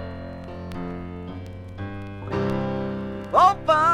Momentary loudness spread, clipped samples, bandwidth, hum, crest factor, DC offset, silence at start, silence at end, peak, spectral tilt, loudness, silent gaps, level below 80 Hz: 18 LU; under 0.1%; 15 kHz; none; 20 dB; under 0.1%; 0 s; 0 s; -4 dBFS; -6.5 dB/octave; -24 LUFS; none; -46 dBFS